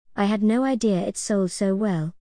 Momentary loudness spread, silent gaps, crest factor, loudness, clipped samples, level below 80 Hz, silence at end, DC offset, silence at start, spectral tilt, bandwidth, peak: 4 LU; none; 14 dB; -23 LUFS; under 0.1%; -58 dBFS; 0.1 s; 0.2%; 0.15 s; -6 dB/octave; 10.5 kHz; -8 dBFS